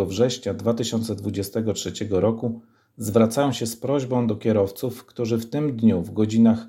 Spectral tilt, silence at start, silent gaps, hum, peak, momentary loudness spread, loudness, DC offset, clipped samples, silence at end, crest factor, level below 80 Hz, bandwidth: -6 dB/octave; 0 s; none; none; -4 dBFS; 9 LU; -23 LUFS; under 0.1%; under 0.1%; 0 s; 18 dB; -60 dBFS; 16.5 kHz